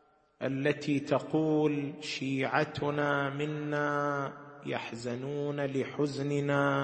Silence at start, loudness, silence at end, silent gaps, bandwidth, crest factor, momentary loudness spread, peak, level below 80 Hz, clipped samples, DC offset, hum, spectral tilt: 0.4 s; -32 LUFS; 0 s; none; 8.8 kHz; 20 dB; 8 LU; -12 dBFS; -70 dBFS; under 0.1%; under 0.1%; none; -6.5 dB/octave